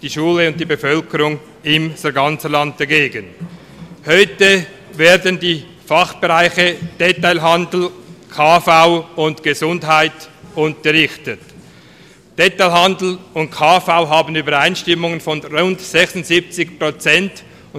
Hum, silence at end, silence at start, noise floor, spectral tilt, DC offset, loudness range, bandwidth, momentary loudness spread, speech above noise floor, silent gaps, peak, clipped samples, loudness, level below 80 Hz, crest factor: none; 0 s; 0.05 s; -43 dBFS; -4 dB/octave; under 0.1%; 3 LU; 16.5 kHz; 12 LU; 29 dB; none; 0 dBFS; under 0.1%; -14 LUFS; -52 dBFS; 16 dB